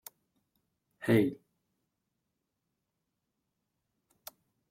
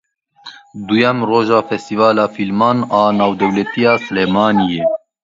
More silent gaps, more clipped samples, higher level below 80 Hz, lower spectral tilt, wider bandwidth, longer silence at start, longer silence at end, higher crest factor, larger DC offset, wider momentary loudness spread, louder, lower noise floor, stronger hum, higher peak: neither; neither; second, -72 dBFS vs -54 dBFS; about the same, -7 dB/octave vs -6.5 dB/octave; first, 16.5 kHz vs 7.8 kHz; first, 1 s vs 0.45 s; first, 3.35 s vs 0.25 s; first, 24 dB vs 14 dB; neither; first, 23 LU vs 5 LU; second, -30 LUFS vs -14 LUFS; first, -85 dBFS vs -40 dBFS; neither; second, -14 dBFS vs 0 dBFS